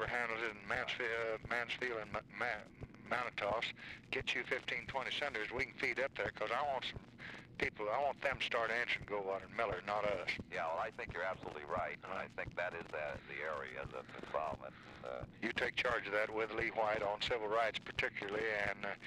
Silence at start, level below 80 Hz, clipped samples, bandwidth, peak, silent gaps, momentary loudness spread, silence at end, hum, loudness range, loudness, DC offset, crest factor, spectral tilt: 0 s; -64 dBFS; under 0.1%; 14 kHz; -24 dBFS; none; 9 LU; 0 s; none; 5 LU; -39 LUFS; under 0.1%; 16 dB; -4 dB/octave